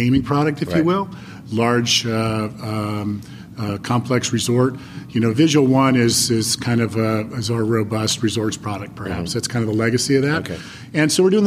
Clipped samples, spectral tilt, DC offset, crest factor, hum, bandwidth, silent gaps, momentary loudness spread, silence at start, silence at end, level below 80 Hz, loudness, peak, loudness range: under 0.1%; -5 dB/octave; under 0.1%; 16 dB; none; 15.5 kHz; none; 12 LU; 0 s; 0 s; -48 dBFS; -19 LUFS; -4 dBFS; 4 LU